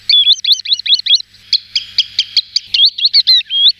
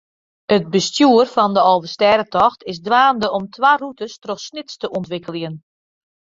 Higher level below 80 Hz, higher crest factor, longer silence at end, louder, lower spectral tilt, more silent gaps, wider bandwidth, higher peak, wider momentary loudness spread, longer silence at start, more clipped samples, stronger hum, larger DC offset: about the same, -60 dBFS vs -58 dBFS; about the same, 12 dB vs 16 dB; second, 0.1 s vs 0.75 s; first, -10 LUFS vs -16 LUFS; second, 4 dB/octave vs -4.5 dB/octave; neither; first, 14.5 kHz vs 7.8 kHz; about the same, -2 dBFS vs 0 dBFS; second, 7 LU vs 15 LU; second, 0.1 s vs 0.5 s; neither; first, 50 Hz at -55 dBFS vs none; neither